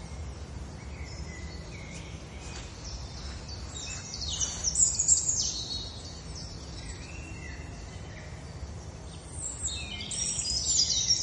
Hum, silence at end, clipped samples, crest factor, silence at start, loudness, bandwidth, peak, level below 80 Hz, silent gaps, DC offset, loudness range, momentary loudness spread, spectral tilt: none; 0 s; under 0.1%; 24 dB; 0 s; -29 LUFS; 11.5 kHz; -10 dBFS; -44 dBFS; none; under 0.1%; 14 LU; 19 LU; -1 dB/octave